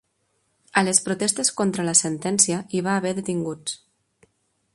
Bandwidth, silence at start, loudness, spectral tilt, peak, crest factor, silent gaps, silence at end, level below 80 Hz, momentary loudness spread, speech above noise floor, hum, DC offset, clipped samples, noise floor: 11.5 kHz; 0.75 s; -21 LUFS; -3 dB/octave; -2 dBFS; 22 dB; none; 1 s; -66 dBFS; 10 LU; 48 dB; none; under 0.1%; under 0.1%; -70 dBFS